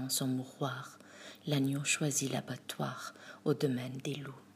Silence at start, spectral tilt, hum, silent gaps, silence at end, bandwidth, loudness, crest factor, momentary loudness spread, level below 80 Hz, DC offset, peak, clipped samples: 0 s; -4 dB/octave; none; none; 0.05 s; 15.5 kHz; -36 LUFS; 20 dB; 14 LU; -82 dBFS; under 0.1%; -16 dBFS; under 0.1%